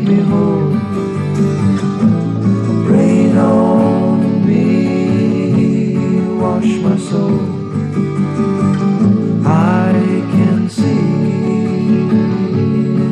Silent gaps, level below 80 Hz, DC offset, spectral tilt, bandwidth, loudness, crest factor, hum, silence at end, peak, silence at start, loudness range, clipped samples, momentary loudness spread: none; -48 dBFS; under 0.1%; -8.5 dB/octave; 9.6 kHz; -13 LUFS; 10 dB; none; 0 s; -2 dBFS; 0 s; 3 LU; under 0.1%; 5 LU